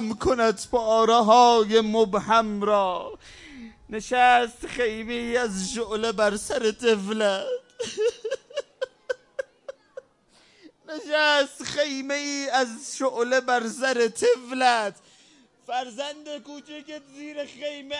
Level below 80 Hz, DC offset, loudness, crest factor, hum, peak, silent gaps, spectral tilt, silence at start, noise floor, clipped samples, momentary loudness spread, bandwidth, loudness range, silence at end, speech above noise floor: -56 dBFS; under 0.1%; -23 LUFS; 20 dB; none; -6 dBFS; none; -3 dB/octave; 0 s; -60 dBFS; under 0.1%; 19 LU; 11.5 kHz; 9 LU; 0 s; 36 dB